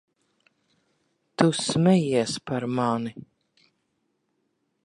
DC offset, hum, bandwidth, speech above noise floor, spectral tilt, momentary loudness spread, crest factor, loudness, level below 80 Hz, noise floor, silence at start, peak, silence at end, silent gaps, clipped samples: under 0.1%; none; 11.5 kHz; 51 dB; -5.5 dB/octave; 10 LU; 24 dB; -24 LUFS; -64 dBFS; -75 dBFS; 1.4 s; -2 dBFS; 1.65 s; none; under 0.1%